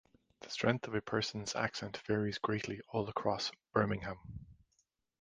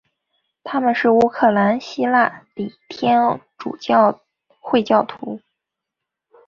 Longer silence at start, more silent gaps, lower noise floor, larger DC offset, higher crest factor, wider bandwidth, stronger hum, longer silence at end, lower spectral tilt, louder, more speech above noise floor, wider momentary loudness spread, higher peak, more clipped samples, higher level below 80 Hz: second, 0.4 s vs 0.65 s; neither; second, -79 dBFS vs -83 dBFS; neither; first, 24 dB vs 18 dB; first, 10 kHz vs 7.2 kHz; neither; second, 0.7 s vs 1.1 s; second, -5 dB/octave vs -6.5 dB/octave; second, -37 LUFS vs -18 LUFS; second, 43 dB vs 65 dB; second, 11 LU vs 16 LU; second, -14 dBFS vs -2 dBFS; neither; about the same, -62 dBFS vs -62 dBFS